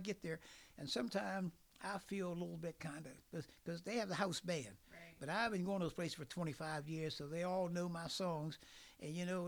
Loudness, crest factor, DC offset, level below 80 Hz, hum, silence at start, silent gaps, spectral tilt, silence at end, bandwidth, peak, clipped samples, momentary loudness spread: -44 LUFS; 20 dB; under 0.1%; -72 dBFS; none; 0 s; none; -5 dB/octave; 0 s; over 20 kHz; -24 dBFS; under 0.1%; 11 LU